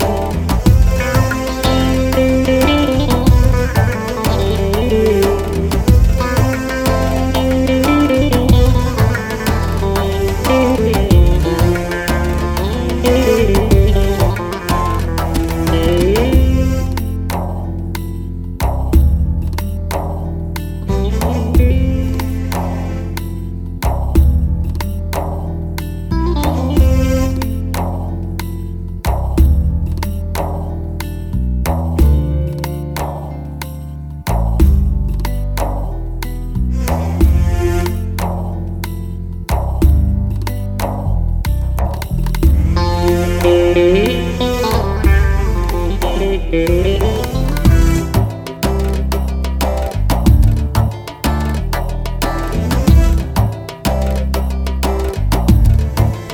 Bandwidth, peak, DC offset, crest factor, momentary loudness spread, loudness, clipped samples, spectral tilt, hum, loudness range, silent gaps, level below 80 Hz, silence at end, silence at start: 18.5 kHz; 0 dBFS; under 0.1%; 14 dB; 10 LU; -16 LUFS; under 0.1%; -6.5 dB/octave; none; 5 LU; none; -18 dBFS; 0 s; 0 s